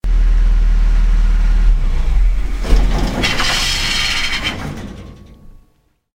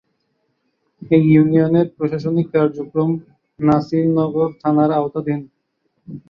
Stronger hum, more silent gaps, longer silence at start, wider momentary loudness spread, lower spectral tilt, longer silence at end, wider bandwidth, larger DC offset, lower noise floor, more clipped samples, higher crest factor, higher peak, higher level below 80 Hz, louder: neither; neither; second, 0.05 s vs 1 s; about the same, 11 LU vs 11 LU; second, -3.5 dB/octave vs -10.5 dB/octave; first, 0.65 s vs 0.1 s; first, 12 kHz vs 5.8 kHz; neither; second, -57 dBFS vs -69 dBFS; neither; about the same, 14 dB vs 16 dB; about the same, 0 dBFS vs -2 dBFS; first, -14 dBFS vs -56 dBFS; about the same, -17 LUFS vs -17 LUFS